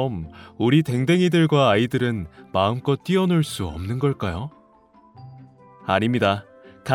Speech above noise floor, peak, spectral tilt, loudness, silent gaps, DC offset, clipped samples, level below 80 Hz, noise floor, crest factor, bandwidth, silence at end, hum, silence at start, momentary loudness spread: 33 dB; -4 dBFS; -6.5 dB/octave; -21 LUFS; none; under 0.1%; under 0.1%; -48 dBFS; -54 dBFS; 18 dB; 15.5 kHz; 0 s; none; 0 s; 14 LU